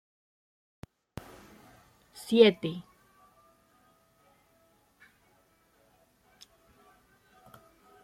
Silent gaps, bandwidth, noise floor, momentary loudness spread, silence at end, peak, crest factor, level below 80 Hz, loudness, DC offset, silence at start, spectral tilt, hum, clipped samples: none; 15 kHz; -67 dBFS; 32 LU; 5.2 s; -6 dBFS; 28 dB; -70 dBFS; -25 LUFS; under 0.1%; 2.25 s; -5.5 dB/octave; none; under 0.1%